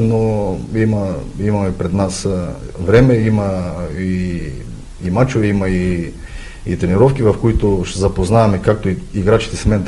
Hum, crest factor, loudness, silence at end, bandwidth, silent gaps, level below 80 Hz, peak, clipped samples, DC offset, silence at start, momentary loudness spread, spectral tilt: none; 16 dB; -16 LUFS; 0 s; 11.5 kHz; none; -28 dBFS; 0 dBFS; under 0.1%; under 0.1%; 0 s; 12 LU; -7 dB/octave